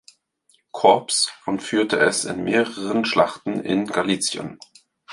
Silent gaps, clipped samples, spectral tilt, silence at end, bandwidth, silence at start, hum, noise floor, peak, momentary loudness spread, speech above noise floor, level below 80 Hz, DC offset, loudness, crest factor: none; under 0.1%; -3 dB/octave; 0 s; 11.5 kHz; 0.75 s; none; -63 dBFS; -2 dBFS; 10 LU; 42 dB; -62 dBFS; under 0.1%; -21 LUFS; 20 dB